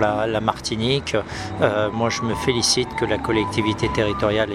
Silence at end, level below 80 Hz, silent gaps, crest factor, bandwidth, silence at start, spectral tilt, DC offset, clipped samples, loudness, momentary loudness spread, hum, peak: 0 s; -40 dBFS; none; 18 dB; 14.5 kHz; 0 s; -4 dB/octave; under 0.1%; under 0.1%; -21 LUFS; 5 LU; none; -2 dBFS